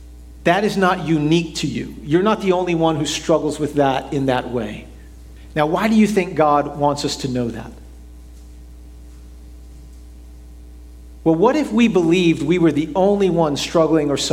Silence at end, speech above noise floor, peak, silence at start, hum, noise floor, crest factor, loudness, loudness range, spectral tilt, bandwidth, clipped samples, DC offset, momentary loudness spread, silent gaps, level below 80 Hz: 0 s; 21 dB; 0 dBFS; 0 s; none; -39 dBFS; 18 dB; -18 LUFS; 9 LU; -5.5 dB/octave; 15.5 kHz; under 0.1%; under 0.1%; 9 LU; none; -40 dBFS